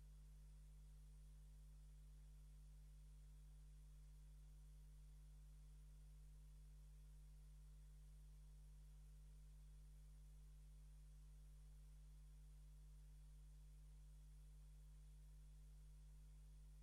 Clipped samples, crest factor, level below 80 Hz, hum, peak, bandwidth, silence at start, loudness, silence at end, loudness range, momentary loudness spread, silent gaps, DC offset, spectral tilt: under 0.1%; 6 dB; -62 dBFS; 50 Hz at -65 dBFS; -56 dBFS; 12.5 kHz; 0 s; -66 LUFS; 0 s; 0 LU; 0 LU; none; under 0.1%; -5.5 dB/octave